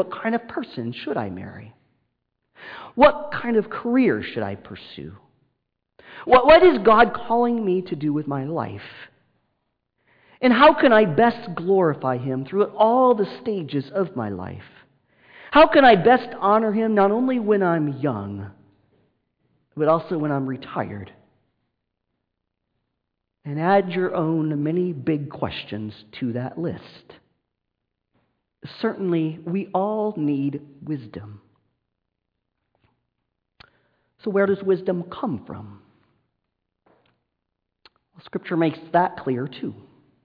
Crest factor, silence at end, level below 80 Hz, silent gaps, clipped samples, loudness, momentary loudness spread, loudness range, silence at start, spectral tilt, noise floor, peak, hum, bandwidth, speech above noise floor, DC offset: 18 dB; 0.5 s; -54 dBFS; none; under 0.1%; -21 LUFS; 21 LU; 13 LU; 0 s; -9.5 dB/octave; -80 dBFS; -6 dBFS; none; 5.2 kHz; 59 dB; under 0.1%